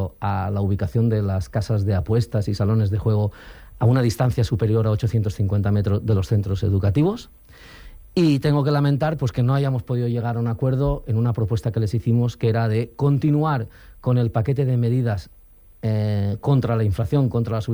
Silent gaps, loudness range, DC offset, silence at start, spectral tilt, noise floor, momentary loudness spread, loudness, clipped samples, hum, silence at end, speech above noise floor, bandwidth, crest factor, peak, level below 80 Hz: none; 1 LU; under 0.1%; 0 s; -8.5 dB/octave; -43 dBFS; 5 LU; -21 LUFS; under 0.1%; none; 0 s; 23 dB; 19.5 kHz; 12 dB; -8 dBFS; -42 dBFS